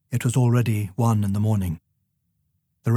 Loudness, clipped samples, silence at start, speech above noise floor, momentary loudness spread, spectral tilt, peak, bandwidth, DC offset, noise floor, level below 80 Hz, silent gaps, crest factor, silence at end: -23 LUFS; under 0.1%; 0.1 s; 51 dB; 11 LU; -7 dB/octave; -8 dBFS; 15 kHz; under 0.1%; -72 dBFS; -52 dBFS; none; 14 dB; 0 s